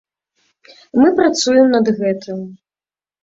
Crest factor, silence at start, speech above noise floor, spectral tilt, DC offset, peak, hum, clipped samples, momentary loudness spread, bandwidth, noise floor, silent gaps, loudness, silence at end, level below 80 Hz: 16 dB; 0.95 s; over 75 dB; -4.5 dB/octave; under 0.1%; -2 dBFS; none; under 0.1%; 16 LU; 7.8 kHz; under -90 dBFS; none; -14 LUFS; 0.7 s; -58 dBFS